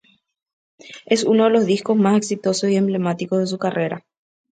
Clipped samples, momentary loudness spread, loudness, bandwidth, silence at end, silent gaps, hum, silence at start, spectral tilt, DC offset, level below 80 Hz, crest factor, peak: under 0.1%; 10 LU; -19 LUFS; 9.4 kHz; 0.6 s; none; none; 0.85 s; -5.5 dB/octave; under 0.1%; -68 dBFS; 18 dB; -2 dBFS